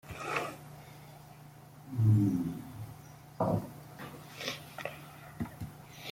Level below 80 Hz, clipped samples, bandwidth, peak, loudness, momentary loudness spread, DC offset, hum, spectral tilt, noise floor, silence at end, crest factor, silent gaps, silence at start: -64 dBFS; under 0.1%; 16.5 kHz; -16 dBFS; -34 LUFS; 24 LU; under 0.1%; none; -6.5 dB/octave; -53 dBFS; 0 s; 20 dB; none; 0.05 s